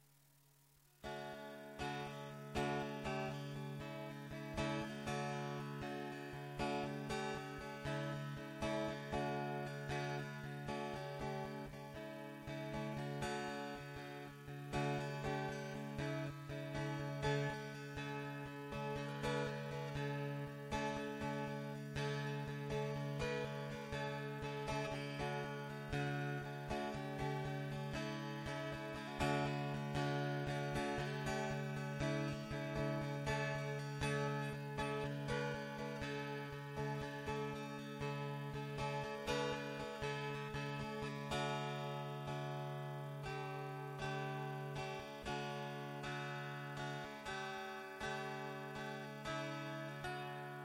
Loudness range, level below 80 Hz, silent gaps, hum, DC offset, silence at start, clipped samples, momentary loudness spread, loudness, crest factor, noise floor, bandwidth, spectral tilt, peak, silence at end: 4 LU; -62 dBFS; none; none; under 0.1%; 1 s; under 0.1%; 7 LU; -44 LUFS; 20 dB; -71 dBFS; 16 kHz; -6 dB/octave; -24 dBFS; 0 s